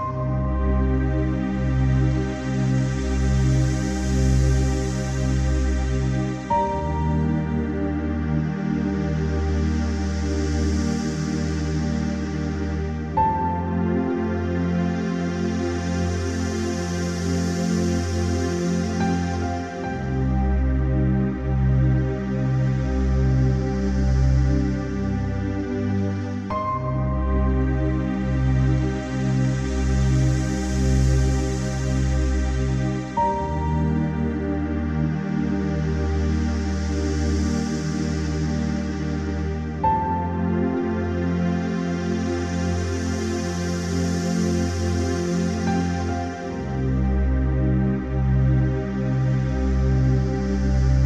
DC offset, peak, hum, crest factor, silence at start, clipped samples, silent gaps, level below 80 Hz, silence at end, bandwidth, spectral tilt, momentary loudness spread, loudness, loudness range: under 0.1%; -8 dBFS; none; 14 dB; 0 s; under 0.1%; none; -28 dBFS; 0 s; 9.6 kHz; -7 dB/octave; 5 LU; -23 LUFS; 2 LU